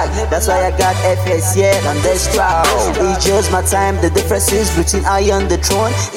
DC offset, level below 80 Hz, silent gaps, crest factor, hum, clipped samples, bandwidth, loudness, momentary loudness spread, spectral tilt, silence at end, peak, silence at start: under 0.1%; -22 dBFS; none; 12 dB; none; under 0.1%; 17 kHz; -14 LUFS; 2 LU; -4 dB/octave; 0 s; -2 dBFS; 0 s